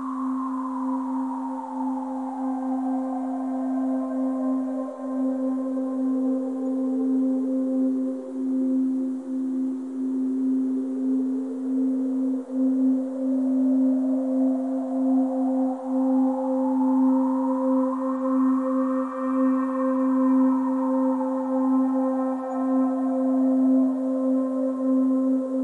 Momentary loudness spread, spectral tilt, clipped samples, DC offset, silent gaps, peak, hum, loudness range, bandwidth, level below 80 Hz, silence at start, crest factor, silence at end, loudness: 7 LU; -8 dB/octave; under 0.1%; under 0.1%; none; -12 dBFS; none; 4 LU; 2.5 kHz; -84 dBFS; 0 s; 10 dB; 0 s; -24 LUFS